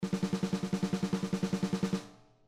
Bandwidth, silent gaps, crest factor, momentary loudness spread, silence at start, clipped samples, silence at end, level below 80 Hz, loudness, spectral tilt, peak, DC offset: 13 kHz; none; 12 dB; 3 LU; 0 s; under 0.1%; 0.3 s; -60 dBFS; -34 LUFS; -6.5 dB/octave; -20 dBFS; under 0.1%